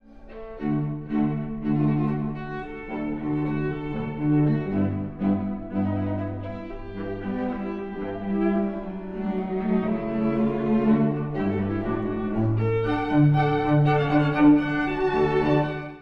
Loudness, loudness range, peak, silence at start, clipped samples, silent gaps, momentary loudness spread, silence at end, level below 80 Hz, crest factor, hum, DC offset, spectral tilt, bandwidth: -25 LUFS; 8 LU; -8 dBFS; 0.1 s; under 0.1%; none; 11 LU; 0 s; -44 dBFS; 16 dB; none; under 0.1%; -10 dB/octave; 5.6 kHz